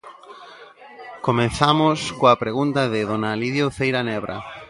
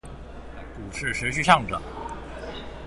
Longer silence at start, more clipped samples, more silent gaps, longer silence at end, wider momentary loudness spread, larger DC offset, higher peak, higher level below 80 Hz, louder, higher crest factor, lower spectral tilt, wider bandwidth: about the same, 0.05 s vs 0.05 s; neither; neither; about the same, 0.05 s vs 0 s; second, 16 LU vs 22 LU; neither; about the same, 0 dBFS vs -2 dBFS; second, -50 dBFS vs -42 dBFS; first, -20 LUFS vs -24 LUFS; about the same, 22 dB vs 26 dB; first, -5.5 dB/octave vs -4 dB/octave; about the same, 11.5 kHz vs 11.5 kHz